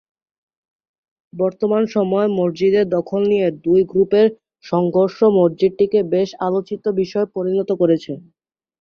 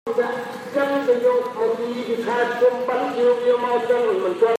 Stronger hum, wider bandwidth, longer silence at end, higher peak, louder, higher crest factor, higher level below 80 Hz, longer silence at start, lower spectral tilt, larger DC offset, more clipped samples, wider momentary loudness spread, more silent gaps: neither; second, 6.6 kHz vs 13.5 kHz; first, 0.65 s vs 0 s; about the same, -4 dBFS vs -6 dBFS; first, -18 LUFS vs -21 LUFS; about the same, 14 dB vs 14 dB; first, -60 dBFS vs -76 dBFS; first, 1.35 s vs 0.05 s; first, -8 dB/octave vs -5 dB/octave; neither; neither; about the same, 6 LU vs 6 LU; neither